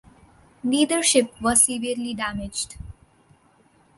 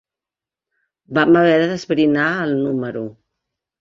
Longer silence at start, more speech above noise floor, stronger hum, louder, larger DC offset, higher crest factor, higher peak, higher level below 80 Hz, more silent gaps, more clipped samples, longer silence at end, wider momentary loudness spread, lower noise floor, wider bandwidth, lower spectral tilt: second, 0.65 s vs 1.1 s; second, 36 dB vs 72 dB; neither; second, -21 LUFS vs -17 LUFS; neither; first, 22 dB vs 16 dB; about the same, -2 dBFS vs -2 dBFS; first, -48 dBFS vs -60 dBFS; neither; neither; first, 1.05 s vs 0.7 s; about the same, 13 LU vs 13 LU; second, -59 dBFS vs -89 dBFS; first, 12 kHz vs 7.4 kHz; second, -2 dB/octave vs -6.5 dB/octave